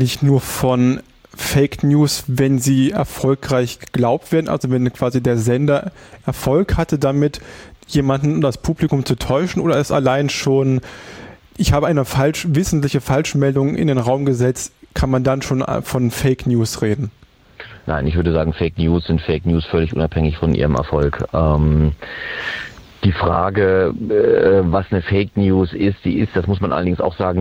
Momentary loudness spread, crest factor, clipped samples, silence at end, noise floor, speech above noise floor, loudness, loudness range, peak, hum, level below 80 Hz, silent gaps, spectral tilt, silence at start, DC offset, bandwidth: 8 LU; 14 dB; under 0.1%; 0 s; -40 dBFS; 24 dB; -17 LUFS; 3 LU; -4 dBFS; none; -32 dBFS; none; -6.5 dB/octave; 0 s; under 0.1%; 17 kHz